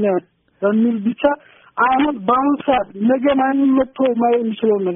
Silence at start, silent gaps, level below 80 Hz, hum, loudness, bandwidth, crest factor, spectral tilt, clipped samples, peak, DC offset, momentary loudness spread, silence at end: 0 s; none; -52 dBFS; none; -17 LUFS; 3.7 kHz; 14 dB; -2.5 dB/octave; under 0.1%; -2 dBFS; under 0.1%; 4 LU; 0 s